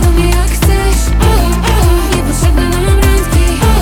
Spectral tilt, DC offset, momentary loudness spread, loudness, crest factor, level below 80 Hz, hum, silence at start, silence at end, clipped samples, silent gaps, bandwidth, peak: -5 dB/octave; under 0.1%; 2 LU; -11 LUFS; 8 dB; -12 dBFS; none; 0 s; 0 s; under 0.1%; none; 18 kHz; 0 dBFS